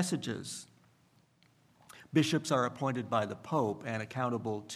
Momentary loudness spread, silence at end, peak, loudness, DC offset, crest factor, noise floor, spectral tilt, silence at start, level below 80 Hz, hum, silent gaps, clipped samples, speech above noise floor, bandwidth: 9 LU; 0 s; -14 dBFS; -33 LUFS; under 0.1%; 20 dB; -68 dBFS; -5 dB/octave; 0 s; -76 dBFS; none; none; under 0.1%; 35 dB; 14.5 kHz